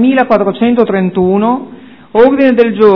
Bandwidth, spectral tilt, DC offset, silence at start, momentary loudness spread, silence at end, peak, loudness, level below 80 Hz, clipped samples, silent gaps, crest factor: 5.4 kHz; -9.5 dB/octave; under 0.1%; 0 s; 8 LU; 0 s; 0 dBFS; -10 LUFS; -46 dBFS; 2%; none; 10 dB